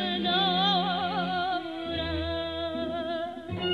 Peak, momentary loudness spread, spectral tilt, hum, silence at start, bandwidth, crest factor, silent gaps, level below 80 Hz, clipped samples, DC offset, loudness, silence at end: -14 dBFS; 9 LU; -6.5 dB/octave; none; 0 s; 11 kHz; 14 dB; none; -48 dBFS; under 0.1%; under 0.1%; -28 LUFS; 0 s